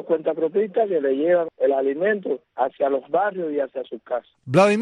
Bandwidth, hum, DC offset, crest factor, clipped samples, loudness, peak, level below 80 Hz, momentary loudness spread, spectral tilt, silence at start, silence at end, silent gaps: 11 kHz; none; under 0.1%; 16 dB; under 0.1%; -22 LUFS; -4 dBFS; -68 dBFS; 9 LU; -6.5 dB/octave; 0 s; 0 s; none